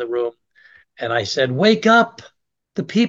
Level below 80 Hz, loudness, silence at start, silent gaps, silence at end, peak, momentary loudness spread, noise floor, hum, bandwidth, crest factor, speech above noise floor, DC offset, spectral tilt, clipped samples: -66 dBFS; -18 LUFS; 0 s; none; 0 s; -2 dBFS; 15 LU; -52 dBFS; none; 7.6 kHz; 18 dB; 34 dB; under 0.1%; -5 dB/octave; under 0.1%